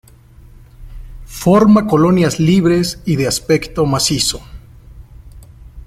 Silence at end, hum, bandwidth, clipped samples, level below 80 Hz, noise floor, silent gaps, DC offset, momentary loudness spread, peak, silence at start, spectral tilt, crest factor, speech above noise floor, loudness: 0.05 s; none; 15.5 kHz; under 0.1%; -36 dBFS; -42 dBFS; none; under 0.1%; 8 LU; -2 dBFS; 0.8 s; -5 dB/octave; 14 dB; 29 dB; -13 LUFS